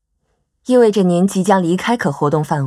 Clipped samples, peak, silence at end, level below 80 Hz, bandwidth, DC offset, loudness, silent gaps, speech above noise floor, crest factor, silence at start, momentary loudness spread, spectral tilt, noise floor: under 0.1%; 0 dBFS; 0 s; -56 dBFS; 13.5 kHz; under 0.1%; -15 LUFS; none; 53 dB; 14 dB; 0.7 s; 5 LU; -6.5 dB/octave; -67 dBFS